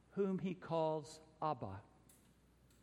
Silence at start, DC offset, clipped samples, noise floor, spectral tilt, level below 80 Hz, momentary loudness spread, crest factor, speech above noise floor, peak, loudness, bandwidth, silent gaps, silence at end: 0.15 s; under 0.1%; under 0.1%; -69 dBFS; -7 dB/octave; -76 dBFS; 13 LU; 18 dB; 28 dB; -26 dBFS; -42 LUFS; 13 kHz; none; 0.95 s